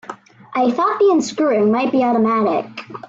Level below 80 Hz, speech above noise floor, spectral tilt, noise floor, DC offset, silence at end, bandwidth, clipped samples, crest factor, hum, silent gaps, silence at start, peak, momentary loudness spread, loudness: -64 dBFS; 20 dB; -5.5 dB/octave; -36 dBFS; under 0.1%; 0 s; 7.8 kHz; under 0.1%; 10 dB; none; none; 0.1 s; -6 dBFS; 10 LU; -17 LUFS